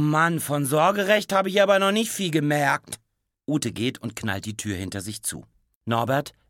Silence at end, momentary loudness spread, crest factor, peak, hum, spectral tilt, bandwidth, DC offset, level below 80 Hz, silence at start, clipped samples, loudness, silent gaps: 0.2 s; 12 LU; 18 dB; -6 dBFS; none; -4.5 dB/octave; 17.5 kHz; under 0.1%; -62 dBFS; 0 s; under 0.1%; -23 LUFS; 5.75-5.81 s